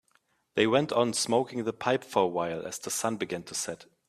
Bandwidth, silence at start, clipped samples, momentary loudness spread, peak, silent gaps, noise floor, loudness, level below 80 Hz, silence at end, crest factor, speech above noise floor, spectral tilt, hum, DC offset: 15 kHz; 0.55 s; under 0.1%; 9 LU; -8 dBFS; none; -70 dBFS; -29 LUFS; -70 dBFS; 0.25 s; 20 dB; 41 dB; -3.5 dB/octave; none; under 0.1%